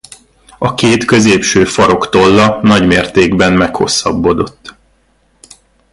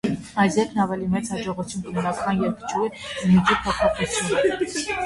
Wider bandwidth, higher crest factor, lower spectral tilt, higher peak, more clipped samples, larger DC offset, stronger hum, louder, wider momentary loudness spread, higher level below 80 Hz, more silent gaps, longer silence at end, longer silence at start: about the same, 11.5 kHz vs 11.5 kHz; about the same, 12 dB vs 16 dB; about the same, -4.5 dB/octave vs -5 dB/octave; first, 0 dBFS vs -6 dBFS; neither; neither; neither; first, -10 LUFS vs -23 LUFS; second, 5 LU vs 9 LU; first, -36 dBFS vs -46 dBFS; neither; first, 1.25 s vs 0 s; first, 0.6 s vs 0.05 s